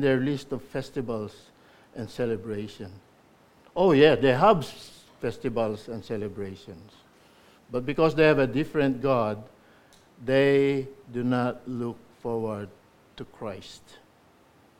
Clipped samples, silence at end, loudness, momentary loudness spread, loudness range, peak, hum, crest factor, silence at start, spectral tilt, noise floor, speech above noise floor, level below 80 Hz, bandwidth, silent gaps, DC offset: under 0.1%; 1.05 s; -26 LUFS; 21 LU; 10 LU; -4 dBFS; none; 22 dB; 0 s; -7 dB/octave; -59 dBFS; 33 dB; -56 dBFS; 15.5 kHz; none; under 0.1%